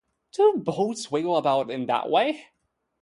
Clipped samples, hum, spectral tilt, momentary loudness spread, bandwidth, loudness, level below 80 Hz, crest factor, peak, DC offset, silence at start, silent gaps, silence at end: under 0.1%; none; -5 dB/octave; 6 LU; 11.5 kHz; -24 LUFS; -70 dBFS; 16 dB; -8 dBFS; under 0.1%; 0.4 s; none; 0.6 s